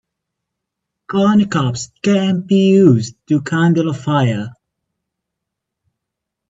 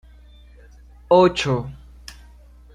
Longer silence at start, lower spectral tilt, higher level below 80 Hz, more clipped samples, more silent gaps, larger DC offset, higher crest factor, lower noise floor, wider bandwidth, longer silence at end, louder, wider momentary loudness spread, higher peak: about the same, 1.1 s vs 1.1 s; about the same, -6.5 dB/octave vs -6 dB/octave; second, -56 dBFS vs -44 dBFS; neither; neither; neither; about the same, 16 dB vs 20 dB; first, -80 dBFS vs -46 dBFS; second, 7.8 kHz vs 11.5 kHz; first, 1.95 s vs 0.65 s; first, -15 LUFS vs -18 LUFS; second, 10 LU vs 26 LU; first, 0 dBFS vs -4 dBFS